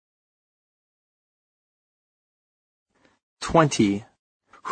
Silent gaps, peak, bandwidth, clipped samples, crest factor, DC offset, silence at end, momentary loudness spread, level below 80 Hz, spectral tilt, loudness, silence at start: 4.19-4.40 s; -2 dBFS; 9.4 kHz; under 0.1%; 26 dB; under 0.1%; 0 s; 16 LU; -54 dBFS; -5.5 dB/octave; -22 LUFS; 3.4 s